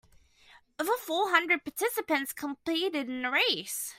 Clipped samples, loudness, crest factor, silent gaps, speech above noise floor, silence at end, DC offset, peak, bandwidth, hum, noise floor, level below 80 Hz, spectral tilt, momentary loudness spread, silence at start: under 0.1%; -29 LUFS; 22 dB; none; 30 dB; 0.05 s; under 0.1%; -8 dBFS; 16 kHz; none; -60 dBFS; -72 dBFS; -1 dB/octave; 7 LU; 0.55 s